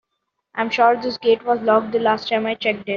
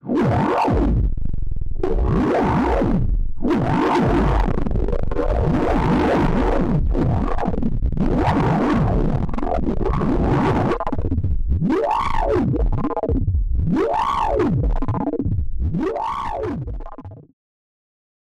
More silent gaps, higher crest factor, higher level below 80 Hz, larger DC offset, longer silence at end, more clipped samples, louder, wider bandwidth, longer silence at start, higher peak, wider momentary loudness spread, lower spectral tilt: neither; first, 18 dB vs 12 dB; second, -64 dBFS vs -24 dBFS; neither; second, 0 s vs 1.1 s; neither; about the same, -19 LUFS vs -21 LUFS; second, 7 kHz vs 8.6 kHz; first, 0.55 s vs 0.05 s; first, -2 dBFS vs -6 dBFS; about the same, 6 LU vs 7 LU; second, -2 dB/octave vs -8.5 dB/octave